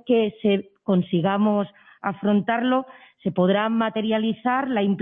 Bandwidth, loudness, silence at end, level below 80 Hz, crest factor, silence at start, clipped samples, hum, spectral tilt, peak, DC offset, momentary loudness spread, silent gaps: 3.8 kHz; -23 LUFS; 0 s; -64 dBFS; 14 dB; 0.05 s; under 0.1%; none; -10.5 dB/octave; -8 dBFS; under 0.1%; 8 LU; none